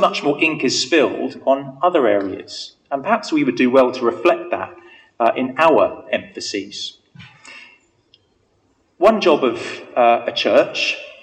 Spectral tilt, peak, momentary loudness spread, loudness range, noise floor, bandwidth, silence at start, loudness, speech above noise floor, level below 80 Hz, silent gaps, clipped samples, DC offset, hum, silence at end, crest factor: -4 dB/octave; -2 dBFS; 14 LU; 4 LU; -62 dBFS; 9.2 kHz; 0 s; -18 LUFS; 44 dB; -64 dBFS; none; under 0.1%; under 0.1%; none; 0.1 s; 18 dB